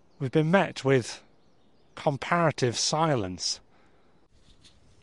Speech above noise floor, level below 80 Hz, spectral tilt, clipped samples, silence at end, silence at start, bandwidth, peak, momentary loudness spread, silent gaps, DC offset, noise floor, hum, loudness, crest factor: 38 dB; -64 dBFS; -4.5 dB/octave; under 0.1%; 1.45 s; 0.2 s; 11.5 kHz; -8 dBFS; 8 LU; none; under 0.1%; -64 dBFS; none; -26 LUFS; 22 dB